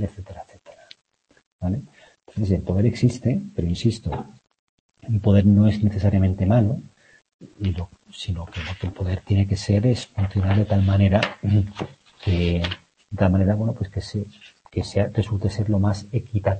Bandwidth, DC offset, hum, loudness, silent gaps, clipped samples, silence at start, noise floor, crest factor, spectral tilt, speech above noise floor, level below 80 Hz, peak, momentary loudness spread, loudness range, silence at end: 8.6 kHz; under 0.1%; none; -22 LUFS; 1.47-1.59 s, 4.59-4.89 s, 7.34-7.39 s; under 0.1%; 0 s; -48 dBFS; 20 dB; -8 dB/octave; 27 dB; -42 dBFS; -2 dBFS; 14 LU; 5 LU; 0 s